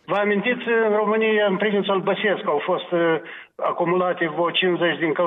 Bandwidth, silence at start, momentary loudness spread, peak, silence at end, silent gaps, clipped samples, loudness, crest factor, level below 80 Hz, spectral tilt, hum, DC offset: 4 kHz; 0.1 s; 4 LU; -8 dBFS; 0 s; none; under 0.1%; -21 LUFS; 12 dB; -74 dBFS; -8 dB/octave; none; under 0.1%